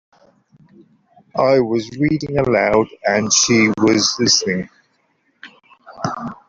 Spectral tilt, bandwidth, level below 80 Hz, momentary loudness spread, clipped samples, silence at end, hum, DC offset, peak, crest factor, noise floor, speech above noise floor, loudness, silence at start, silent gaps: -3.5 dB/octave; 7.8 kHz; -50 dBFS; 12 LU; under 0.1%; 0.15 s; none; under 0.1%; -2 dBFS; 18 dB; -63 dBFS; 47 dB; -16 LUFS; 1.35 s; none